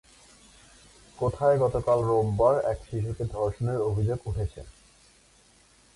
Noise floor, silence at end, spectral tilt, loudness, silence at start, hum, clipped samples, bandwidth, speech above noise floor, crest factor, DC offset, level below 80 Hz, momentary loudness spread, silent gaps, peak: -59 dBFS; 1.25 s; -8 dB/octave; -27 LUFS; 1.2 s; none; under 0.1%; 11.5 kHz; 34 dB; 18 dB; under 0.1%; -44 dBFS; 10 LU; none; -10 dBFS